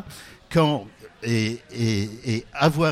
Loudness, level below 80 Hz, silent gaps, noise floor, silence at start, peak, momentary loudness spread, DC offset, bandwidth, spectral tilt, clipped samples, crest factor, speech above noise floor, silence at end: -24 LUFS; -52 dBFS; none; -43 dBFS; 0 s; -6 dBFS; 16 LU; under 0.1%; 15 kHz; -6 dB/octave; under 0.1%; 18 dB; 20 dB; 0 s